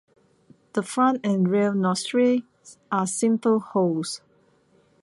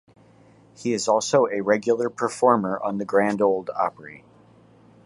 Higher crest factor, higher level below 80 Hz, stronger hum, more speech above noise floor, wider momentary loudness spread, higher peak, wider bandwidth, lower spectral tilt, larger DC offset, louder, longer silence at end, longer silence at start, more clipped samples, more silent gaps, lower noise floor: second, 14 dB vs 20 dB; about the same, -72 dBFS vs -68 dBFS; neither; first, 39 dB vs 31 dB; about the same, 8 LU vs 8 LU; second, -10 dBFS vs -4 dBFS; about the same, 11.5 kHz vs 11.5 kHz; about the same, -5.5 dB/octave vs -4.5 dB/octave; neither; about the same, -23 LUFS vs -22 LUFS; about the same, 0.85 s vs 0.9 s; about the same, 0.75 s vs 0.8 s; neither; neither; first, -61 dBFS vs -53 dBFS